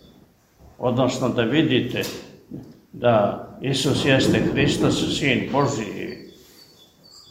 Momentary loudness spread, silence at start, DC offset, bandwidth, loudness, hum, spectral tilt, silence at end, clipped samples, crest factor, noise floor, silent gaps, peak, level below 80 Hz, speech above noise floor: 18 LU; 0.8 s; under 0.1%; 16 kHz; -21 LUFS; none; -5 dB/octave; 0.1 s; under 0.1%; 18 dB; -54 dBFS; none; -4 dBFS; -48 dBFS; 34 dB